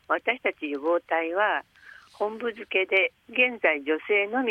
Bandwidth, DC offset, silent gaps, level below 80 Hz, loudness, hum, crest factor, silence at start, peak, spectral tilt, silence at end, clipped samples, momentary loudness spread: 8.8 kHz; under 0.1%; none; -74 dBFS; -25 LUFS; none; 20 dB; 0.1 s; -8 dBFS; -4.5 dB/octave; 0 s; under 0.1%; 9 LU